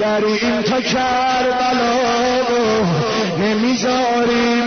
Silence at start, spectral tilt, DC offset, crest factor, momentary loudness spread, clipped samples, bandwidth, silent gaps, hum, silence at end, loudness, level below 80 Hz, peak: 0 s; -4.5 dB/octave; 0.2%; 10 dB; 2 LU; under 0.1%; 6.6 kHz; none; none; 0 s; -16 LUFS; -48 dBFS; -6 dBFS